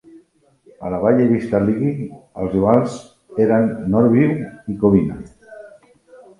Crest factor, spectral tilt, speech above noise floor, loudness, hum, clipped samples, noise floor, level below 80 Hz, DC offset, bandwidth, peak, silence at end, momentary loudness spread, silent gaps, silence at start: 18 dB; -9 dB/octave; 38 dB; -18 LUFS; none; under 0.1%; -55 dBFS; -46 dBFS; under 0.1%; 11 kHz; 0 dBFS; 0.7 s; 15 LU; none; 0.8 s